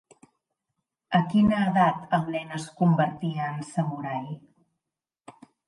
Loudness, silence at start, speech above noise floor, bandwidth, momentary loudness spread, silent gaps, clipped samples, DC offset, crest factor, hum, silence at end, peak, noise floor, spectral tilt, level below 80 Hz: -26 LUFS; 1.1 s; 63 dB; 11.5 kHz; 12 LU; none; under 0.1%; under 0.1%; 20 dB; none; 1.3 s; -8 dBFS; -88 dBFS; -7 dB/octave; -60 dBFS